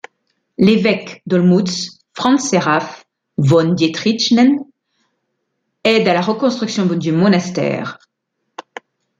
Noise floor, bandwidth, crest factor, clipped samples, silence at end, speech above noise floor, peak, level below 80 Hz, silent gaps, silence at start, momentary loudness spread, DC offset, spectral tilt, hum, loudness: -73 dBFS; 9 kHz; 16 dB; under 0.1%; 0.6 s; 59 dB; -2 dBFS; -60 dBFS; none; 0.6 s; 14 LU; under 0.1%; -5.5 dB/octave; none; -15 LUFS